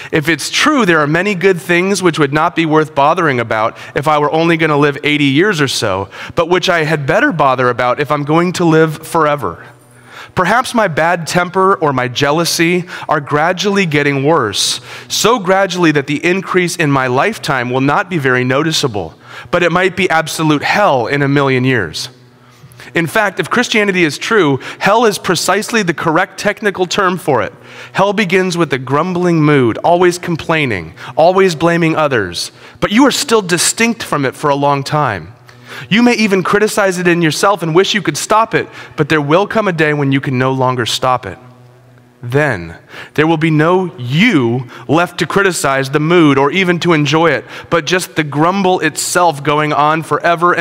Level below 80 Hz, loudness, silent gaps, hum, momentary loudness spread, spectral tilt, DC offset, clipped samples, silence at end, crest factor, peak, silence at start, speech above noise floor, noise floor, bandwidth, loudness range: -50 dBFS; -12 LUFS; none; none; 7 LU; -4.5 dB/octave; under 0.1%; under 0.1%; 0 s; 12 dB; 0 dBFS; 0 s; 31 dB; -43 dBFS; 16.5 kHz; 2 LU